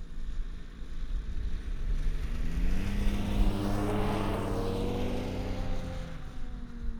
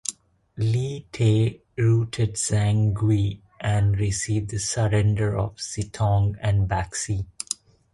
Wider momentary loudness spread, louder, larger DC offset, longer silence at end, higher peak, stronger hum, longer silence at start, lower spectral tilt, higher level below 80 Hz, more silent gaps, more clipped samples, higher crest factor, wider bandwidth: first, 13 LU vs 9 LU; second, -35 LUFS vs -24 LUFS; neither; second, 0 s vs 0.4 s; second, -14 dBFS vs -4 dBFS; neither; about the same, 0 s vs 0.1 s; first, -7 dB/octave vs -5.5 dB/octave; first, -32 dBFS vs -40 dBFS; neither; neither; about the same, 16 dB vs 20 dB; first, 13 kHz vs 11.5 kHz